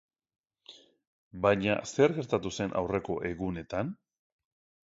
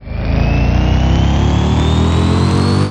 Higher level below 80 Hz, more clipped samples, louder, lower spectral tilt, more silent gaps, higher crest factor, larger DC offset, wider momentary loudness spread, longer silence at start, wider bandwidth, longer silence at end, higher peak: second, -56 dBFS vs -18 dBFS; neither; second, -30 LUFS vs -13 LUFS; second, -5.5 dB/octave vs -7 dB/octave; first, 1.07-1.31 s vs none; first, 22 dB vs 10 dB; second, under 0.1% vs 1%; first, 10 LU vs 2 LU; first, 0.7 s vs 0 s; second, 8 kHz vs 10 kHz; first, 0.9 s vs 0 s; second, -10 dBFS vs -2 dBFS